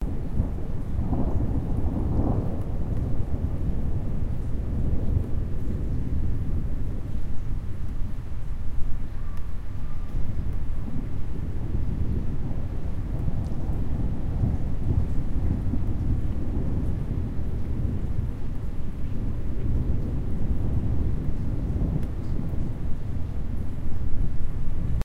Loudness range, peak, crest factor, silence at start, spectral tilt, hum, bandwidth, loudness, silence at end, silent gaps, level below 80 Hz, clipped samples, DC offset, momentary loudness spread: 5 LU; -8 dBFS; 14 dB; 0 s; -9.5 dB/octave; none; 3 kHz; -30 LUFS; 0 s; none; -28 dBFS; under 0.1%; under 0.1%; 7 LU